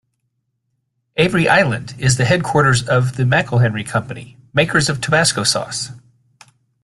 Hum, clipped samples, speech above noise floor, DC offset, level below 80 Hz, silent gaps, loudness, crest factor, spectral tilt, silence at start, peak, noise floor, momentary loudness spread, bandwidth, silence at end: none; under 0.1%; 55 dB; under 0.1%; -48 dBFS; none; -16 LUFS; 18 dB; -4.5 dB/octave; 1.15 s; 0 dBFS; -71 dBFS; 11 LU; 12.5 kHz; 0.85 s